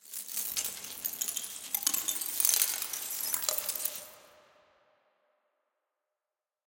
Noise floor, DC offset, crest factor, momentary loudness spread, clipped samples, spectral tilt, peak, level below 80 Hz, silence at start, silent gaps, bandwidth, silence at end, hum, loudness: under -90 dBFS; under 0.1%; 34 dB; 11 LU; under 0.1%; 2 dB/octave; -2 dBFS; -78 dBFS; 0.05 s; none; 17.5 kHz; 2.35 s; none; -30 LUFS